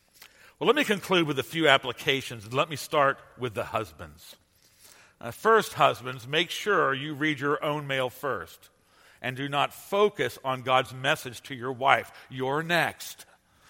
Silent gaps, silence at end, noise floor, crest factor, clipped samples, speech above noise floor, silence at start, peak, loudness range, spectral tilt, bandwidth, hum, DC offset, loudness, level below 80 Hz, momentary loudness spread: none; 0.45 s; -58 dBFS; 26 dB; under 0.1%; 30 dB; 0.6 s; -2 dBFS; 4 LU; -4 dB/octave; 16.5 kHz; none; under 0.1%; -27 LUFS; -66 dBFS; 13 LU